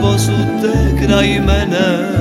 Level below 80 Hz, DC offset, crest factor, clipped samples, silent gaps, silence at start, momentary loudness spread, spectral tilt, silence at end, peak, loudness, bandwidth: -20 dBFS; under 0.1%; 12 dB; under 0.1%; none; 0 s; 3 LU; -6 dB/octave; 0 s; 0 dBFS; -13 LUFS; 16 kHz